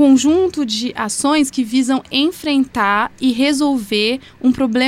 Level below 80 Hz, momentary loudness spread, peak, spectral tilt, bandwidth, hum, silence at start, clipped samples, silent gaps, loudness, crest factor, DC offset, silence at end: -50 dBFS; 4 LU; -2 dBFS; -3 dB/octave; 15.5 kHz; none; 0 s; under 0.1%; none; -16 LUFS; 12 dB; under 0.1%; 0 s